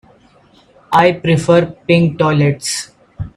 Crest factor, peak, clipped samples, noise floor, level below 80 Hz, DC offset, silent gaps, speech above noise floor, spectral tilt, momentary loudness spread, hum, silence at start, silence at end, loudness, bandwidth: 14 dB; 0 dBFS; under 0.1%; -49 dBFS; -44 dBFS; under 0.1%; none; 36 dB; -5.5 dB/octave; 10 LU; none; 0.9 s; 0.05 s; -14 LUFS; 14 kHz